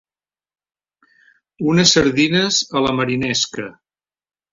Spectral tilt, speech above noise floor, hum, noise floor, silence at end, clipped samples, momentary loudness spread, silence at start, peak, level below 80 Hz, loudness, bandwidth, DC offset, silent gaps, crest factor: -3.5 dB/octave; over 73 dB; none; under -90 dBFS; 0.8 s; under 0.1%; 11 LU; 1.6 s; -2 dBFS; -50 dBFS; -16 LUFS; 8 kHz; under 0.1%; none; 18 dB